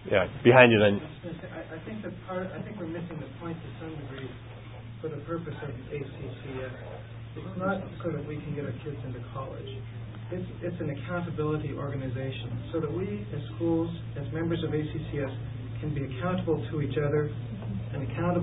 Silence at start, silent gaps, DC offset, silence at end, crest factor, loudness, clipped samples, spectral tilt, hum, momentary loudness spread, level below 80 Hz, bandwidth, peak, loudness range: 0 s; none; under 0.1%; 0 s; 28 dB; -30 LUFS; under 0.1%; -11 dB/octave; none; 12 LU; -50 dBFS; 4 kHz; -2 dBFS; 7 LU